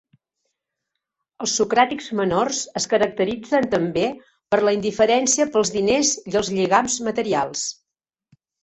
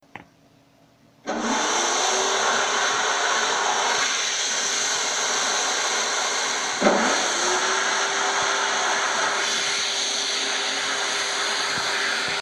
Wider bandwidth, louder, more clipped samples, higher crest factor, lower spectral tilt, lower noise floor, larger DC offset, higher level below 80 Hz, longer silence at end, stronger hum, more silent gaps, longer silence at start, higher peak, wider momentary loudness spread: second, 8.4 kHz vs 15 kHz; about the same, -20 LUFS vs -21 LUFS; neither; about the same, 20 dB vs 20 dB; first, -3 dB/octave vs 0 dB/octave; first, -87 dBFS vs -56 dBFS; neither; first, -56 dBFS vs -66 dBFS; first, 0.9 s vs 0 s; neither; neither; first, 1.4 s vs 0.15 s; about the same, -2 dBFS vs -4 dBFS; first, 6 LU vs 2 LU